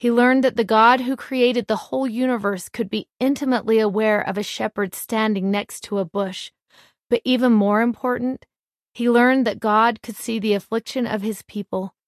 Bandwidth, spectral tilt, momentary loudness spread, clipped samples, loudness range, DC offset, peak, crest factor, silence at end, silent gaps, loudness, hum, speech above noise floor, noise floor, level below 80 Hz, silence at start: 14 kHz; -5 dB/octave; 11 LU; under 0.1%; 3 LU; under 0.1%; -2 dBFS; 18 dB; 0.2 s; 3.13-3.17 s, 8.59-8.68 s, 8.74-8.93 s; -20 LUFS; none; 36 dB; -56 dBFS; -64 dBFS; 0 s